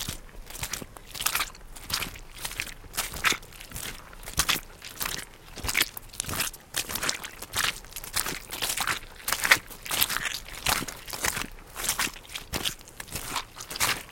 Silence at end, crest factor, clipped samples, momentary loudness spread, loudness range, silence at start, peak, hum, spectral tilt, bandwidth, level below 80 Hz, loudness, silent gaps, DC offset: 0 s; 30 dB; under 0.1%; 12 LU; 4 LU; 0 s; 0 dBFS; none; -0.5 dB/octave; 17 kHz; -46 dBFS; -29 LUFS; none; under 0.1%